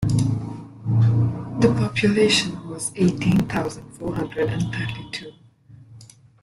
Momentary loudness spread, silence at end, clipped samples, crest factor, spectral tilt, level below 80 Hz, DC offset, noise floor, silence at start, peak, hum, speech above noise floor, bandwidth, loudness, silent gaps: 14 LU; 0.4 s; under 0.1%; 18 dB; -5.5 dB/octave; -48 dBFS; under 0.1%; -49 dBFS; 0 s; -4 dBFS; none; 27 dB; 12 kHz; -22 LUFS; none